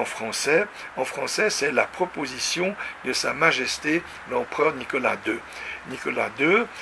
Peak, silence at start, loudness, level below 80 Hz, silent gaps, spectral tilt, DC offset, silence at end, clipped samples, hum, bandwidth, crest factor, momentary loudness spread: -4 dBFS; 0 s; -24 LUFS; -60 dBFS; none; -2.5 dB/octave; under 0.1%; 0 s; under 0.1%; none; 11 kHz; 22 dB; 10 LU